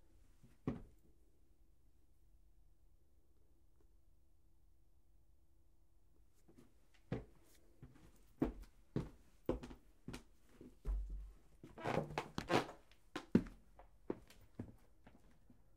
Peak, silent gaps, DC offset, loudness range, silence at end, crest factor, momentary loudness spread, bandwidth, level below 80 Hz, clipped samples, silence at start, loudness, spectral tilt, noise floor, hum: -16 dBFS; none; under 0.1%; 15 LU; 0.65 s; 32 dB; 24 LU; 15.5 kHz; -58 dBFS; under 0.1%; 0.45 s; -45 LUFS; -6.5 dB/octave; -73 dBFS; none